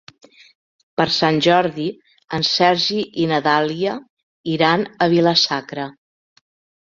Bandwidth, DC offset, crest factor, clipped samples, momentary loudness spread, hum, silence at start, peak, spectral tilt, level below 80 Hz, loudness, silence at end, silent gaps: 7.6 kHz; under 0.1%; 20 dB; under 0.1%; 14 LU; none; 1 s; 0 dBFS; -5 dB/octave; -60 dBFS; -18 LUFS; 0.9 s; 4.10-4.17 s, 4.23-4.44 s